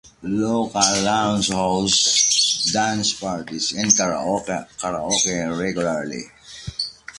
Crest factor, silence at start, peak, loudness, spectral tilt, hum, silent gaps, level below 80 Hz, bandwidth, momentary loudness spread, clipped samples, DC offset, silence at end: 20 dB; 0.2 s; -2 dBFS; -19 LUFS; -2 dB/octave; none; none; -50 dBFS; 11.5 kHz; 12 LU; under 0.1%; under 0.1%; 0 s